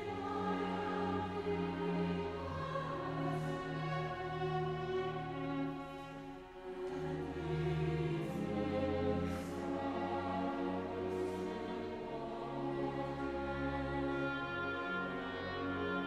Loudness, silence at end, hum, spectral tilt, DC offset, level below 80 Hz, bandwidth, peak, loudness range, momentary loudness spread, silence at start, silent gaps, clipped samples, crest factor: -39 LUFS; 0 s; none; -7.5 dB/octave; under 0.1%; -58 dBFS; 13 kHz; -22 dBFS; 3 LU; 6 LU; 0 s; none; under 0.1%; 16 dB